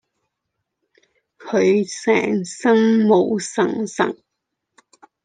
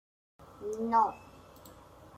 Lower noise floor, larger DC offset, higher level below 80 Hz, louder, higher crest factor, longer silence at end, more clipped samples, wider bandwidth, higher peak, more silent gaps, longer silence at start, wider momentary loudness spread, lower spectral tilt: first, -78 dBFS vs -54 dBFS; neither; about the same, -70 dBFS vs -66 dBFS; first, -18 LUFS vs -31 LUFS; about the same, 18 dB vs 20 dB; first, 1.1 s vs 0 s; neither; second, 9.6 kHz vs 16 kHz; first, -4 dBFS vs -14 dBFS; neither; first, 1.4 s vs 0.4 s; second, 8 LU vs 26 LU; about the same, -5.5 dB/octave vs -6 dB/octave